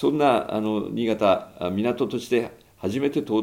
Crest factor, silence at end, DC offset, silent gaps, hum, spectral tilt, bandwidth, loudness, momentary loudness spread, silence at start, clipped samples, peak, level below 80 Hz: 18 dB; 0 s; under 0.1%; none; none; -6.5 dB/octave; 16.5 kHz; -24 LUFS; 8 LU; 0 s; under 0.1%; -6 dBFS; -62 dBFS